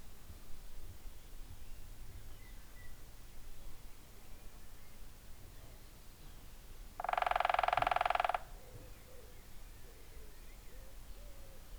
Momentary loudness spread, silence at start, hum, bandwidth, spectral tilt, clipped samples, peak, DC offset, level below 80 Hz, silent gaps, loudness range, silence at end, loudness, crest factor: 24 LU; 0 s; none; over 20 kHz; -3.5 dB/octave; under 0.1%; -18 dBFS; under 0.1%; -52 dBFS; none; 20 LU; 0 s; -35 LUFS; 24 dB